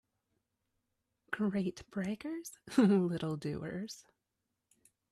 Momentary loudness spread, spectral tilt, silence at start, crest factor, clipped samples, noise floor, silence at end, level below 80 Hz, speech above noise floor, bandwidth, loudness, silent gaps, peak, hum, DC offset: 15 LU; -6.5 dB/octave; 1.3 s; 20 dB; under 0.1%; -86 dBFS; 1.1 s; -70 dBFS; 52 dB; 14 kHz; -35 LUFS; none; -16 dBFS; none; under 0.1%